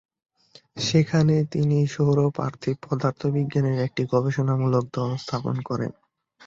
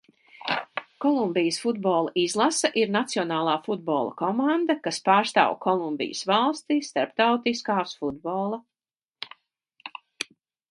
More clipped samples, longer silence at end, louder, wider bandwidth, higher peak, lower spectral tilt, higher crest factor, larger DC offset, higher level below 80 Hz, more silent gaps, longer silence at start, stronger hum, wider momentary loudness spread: neither; about the same, 0.55 s vs 0.45 s; about the same, -24 LUFS vs -25 LUFS; second, 7.6 kHz vs 11.5 kHz; second, -8 dBFS vs -4 dBFS; first, -7 dB/octave vs -4 dB/octave; about the same, 16 dB vs 20 dB; neither; first, -58 dBFS vs -72 dBFS; neither; first, 0.75 s vs 0.45 s; neither; second, 8 LU vs 14 LU